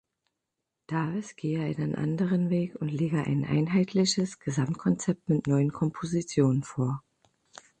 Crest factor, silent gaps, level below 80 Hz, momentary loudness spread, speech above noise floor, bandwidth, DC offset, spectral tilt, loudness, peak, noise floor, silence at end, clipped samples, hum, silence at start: 18 dB; none; -62 dBFS; 7 LU; 58 dB; 9 kHz; under 0.1%; -6.5 dB/octave; -28 LUFS; -12 dBFS; -85 dBFS; 0.8 s; under 0.1%; none; 0.9 s